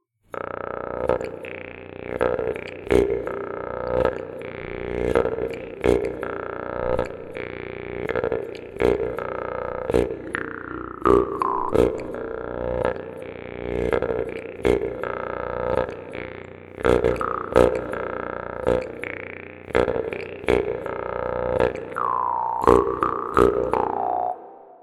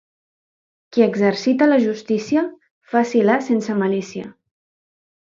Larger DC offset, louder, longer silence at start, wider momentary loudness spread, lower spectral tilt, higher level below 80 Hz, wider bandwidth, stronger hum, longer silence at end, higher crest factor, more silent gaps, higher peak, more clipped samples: neither; second, -25 LUFS vs -19 LUFS; second, 0.35 s vs 0.9 s; first, 14 LU vs 11 LU; about the same, -7 dB/octave vs -6 dB/octave; first, -40 dBFS vs -68 dBFS; first, 13 kHz vs 7.6 kHz; first, 60 Hz at -50 dBFS vs none; second, 0.05 s vs 1.1 s; first, 24 dB vs 18 dB; second, none vs 2.71-2.81 s; about the same, 0 dBFS vs -2 dBFS; neither